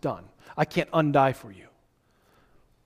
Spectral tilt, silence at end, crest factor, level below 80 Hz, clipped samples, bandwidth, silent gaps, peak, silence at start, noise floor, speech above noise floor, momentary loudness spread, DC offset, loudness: -7 dB/octave; 1.3 s; 22 dB; -60 dBFS; under 0.1%; 15.5 kHz; none; -8 dBFS; 0.05 s; -66 dBFS; 40 dB; 18 LU; under 0.1%; -25 LUFS